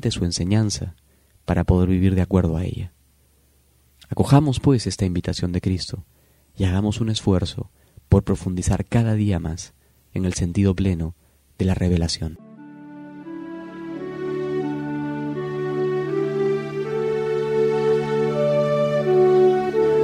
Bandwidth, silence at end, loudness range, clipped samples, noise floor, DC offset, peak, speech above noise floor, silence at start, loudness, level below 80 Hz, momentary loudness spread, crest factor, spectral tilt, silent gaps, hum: 12.5 kHz; 0 s; 6 LU; under 0.1%; -59 dBFS; under 0.1%; 0 dBFS; 38 dB; 0.05 s; -22 LUFS; -38 dBFS; 16 LU; 20 dB; -6.5 dB/octave; none; none